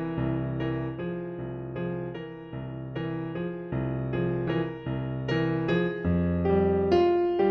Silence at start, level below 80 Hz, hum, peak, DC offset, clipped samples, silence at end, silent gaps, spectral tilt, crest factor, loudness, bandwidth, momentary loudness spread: 0 s; -48 dBFS; none; -12 dBFS; under 0.1%; under 0.1%; 0 s; none; -9.5 dB/octave; 16 dB; -29 LUFS; 6.2 kHz; 12 LU